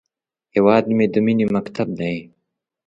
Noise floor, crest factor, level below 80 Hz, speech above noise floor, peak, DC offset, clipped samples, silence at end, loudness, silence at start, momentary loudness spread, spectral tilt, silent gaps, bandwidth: -76 dBFS; 18 dB; -56 dBFS; 59 dB; -2 dBFS; under 0.1%; under 0.1%; 0.65 s; -19 LUFS; 0.55 s; 10 LU; -8.5 dB/octave; none; 7.4 kHz